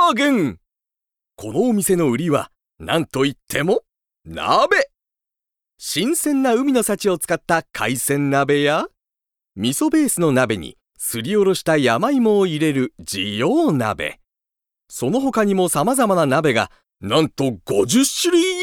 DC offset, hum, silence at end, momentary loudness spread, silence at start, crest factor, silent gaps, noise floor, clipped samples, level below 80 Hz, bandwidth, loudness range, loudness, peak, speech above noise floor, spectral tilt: under 0.1%; none; 0 s; 10 LU; 0 s; 18 dB; none; -87 dBFS; under 0.1%; -54 dBFS; 19.5 kHz; 3 LU; -19 LUFS; -2 dBFS; 69 dB; -4.5 dB/octave